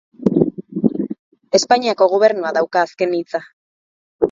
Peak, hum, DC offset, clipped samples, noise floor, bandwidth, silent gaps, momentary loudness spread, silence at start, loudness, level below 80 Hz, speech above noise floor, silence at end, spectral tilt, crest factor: 0 dBFS; none; under 0.1%; under 0.1%; under -90 dBFS; 7.8 kHz; 1.19-1.32 s, 3.53-4.19 s; 12 LU; 0.2 s; -18 LUFS; -56 dBFS; over 74 dB; 0 s; -5 dB/octave; 18 dB